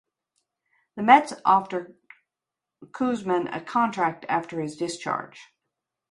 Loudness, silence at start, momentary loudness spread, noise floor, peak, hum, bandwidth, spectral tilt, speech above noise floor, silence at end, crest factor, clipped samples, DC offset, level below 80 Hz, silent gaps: -24 LUFS; 0.95 s; 17 LU; -88 dBFS; -2 dBFS; none; 11.5 kHz; -5 dB/octave; 64 dB; 0.7 s; 24 dB; under 0.1%; under 0.1%; -72 dBFS; none